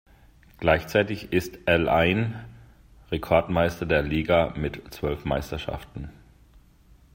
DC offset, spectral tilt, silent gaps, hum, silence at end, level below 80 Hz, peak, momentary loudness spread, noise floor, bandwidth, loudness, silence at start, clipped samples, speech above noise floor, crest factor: under 0.1%; -6.5 dB/octave; none; none; 1.05 s; -44 dBFS; -4 dBFS; 13 LU; -55 dBFS; 16 kHz; -25 LUFS; 0.6 s; under 0.1%; 31 dB; 22 dB